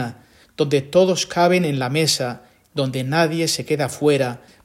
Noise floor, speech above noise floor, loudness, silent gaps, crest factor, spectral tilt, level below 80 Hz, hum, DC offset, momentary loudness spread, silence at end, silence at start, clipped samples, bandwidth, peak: -39 dBFS; 20 dB; -19 LUFS; none; 18 dB; -4.5 dB/octave; -60 dBFS; none; under 0.1%; 9 LU; 0.3 s; 0 s; under 0.1%; 16.5 kHz; -2 dBFS